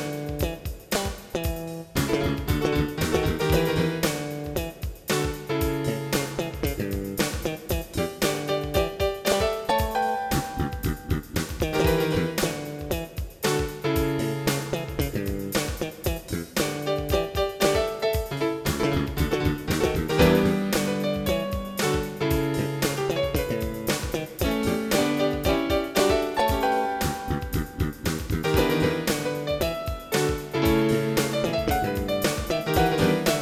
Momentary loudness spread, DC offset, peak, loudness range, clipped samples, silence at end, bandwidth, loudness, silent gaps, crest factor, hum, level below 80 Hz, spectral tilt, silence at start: 8 LU; under 0.1%; -6 dBFS; 4 LU; under 0.1%; 0 s; 19 kHz; -26 LUFS; none; 20 dB; none; -36 dBFS; -5 dB/octave; 0 s